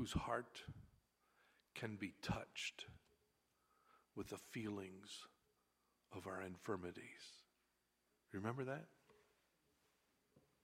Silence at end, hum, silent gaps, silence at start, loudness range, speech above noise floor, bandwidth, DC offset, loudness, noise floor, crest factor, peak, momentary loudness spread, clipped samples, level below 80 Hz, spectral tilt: 0.25 s; 60 Hz at -80 dBFS; none; 0 s; 4 LU; 36 dB; 16 kHz; under 0.1%; -50 LUFS; -85 dBFS; 24 dB; -28 dBFS; 13 LU; under 0.1%; -68 dBFS; -5 dB/octave